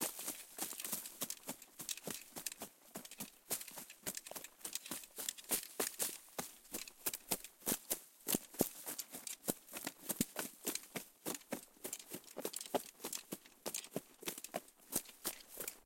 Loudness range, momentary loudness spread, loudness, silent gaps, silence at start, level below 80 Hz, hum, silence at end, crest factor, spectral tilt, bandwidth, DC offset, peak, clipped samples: 5 LU; 9 LU; -43 LUFS; none; 0 s; -76 dBFS; none; 0 s; 32 dB; -2 dB/octave; 17 kHz; under 0.1%; -14 dBFS; under 0.1%